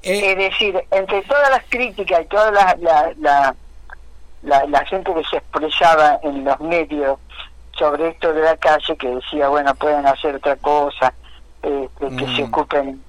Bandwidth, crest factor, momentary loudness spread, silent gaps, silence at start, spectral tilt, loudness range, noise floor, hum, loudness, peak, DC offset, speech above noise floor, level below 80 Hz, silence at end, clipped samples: 15 kHz; 14 dB; 10 LU; none; 0.05 s; -4 dB/octave; 3 LU; -36 dBFS; none; -17 LUFS; -4 dBFS; under 0.1%; 20 dB; -42 dBFS; 0.05 s; under 0.1%